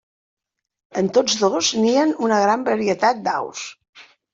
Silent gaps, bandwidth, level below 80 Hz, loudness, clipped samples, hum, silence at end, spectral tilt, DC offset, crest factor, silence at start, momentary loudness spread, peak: 3.89-3.93 s; 7.8 kHz; -66 dBFS; -19 LUFS; under 0.1%; none; 0.3 s; -3.5 dB/octave; under 0.1%; 16 dB; 0.95 s; 12 LU; -4 dBFS